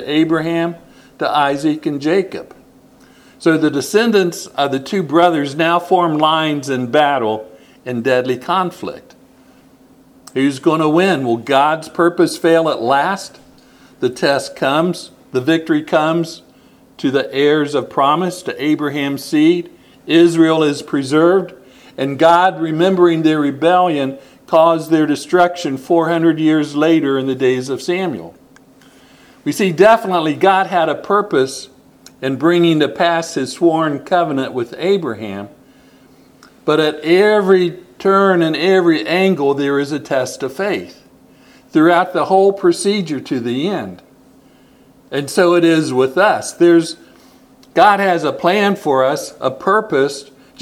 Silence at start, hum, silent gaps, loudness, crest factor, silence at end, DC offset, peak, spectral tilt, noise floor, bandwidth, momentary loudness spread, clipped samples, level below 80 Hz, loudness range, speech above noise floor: 0 s; none; none; -15 LUFS; 16 dB; 0.4 s; under 0.1%; 0 dBFS; -5.5 dB/octave; -47 dBFS; 14.5 kHz; 11 LU; under 0.1%; -62 dBFS; 4 LU; 33 dB